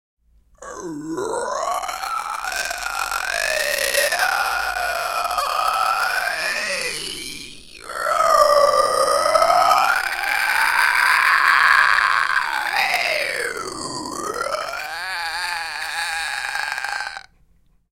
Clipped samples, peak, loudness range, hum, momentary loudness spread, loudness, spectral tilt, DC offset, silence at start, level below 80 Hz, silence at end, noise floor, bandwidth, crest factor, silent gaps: under 0.1%; 0 dBFS; 9 LU; none; 13 LU; -19 LUFS; -0.5 dB/octave; under 0.1%; 0.6 s; -52 dBFS; 0.75 s; -57 dBFS; 17 kHz; 20 dB; none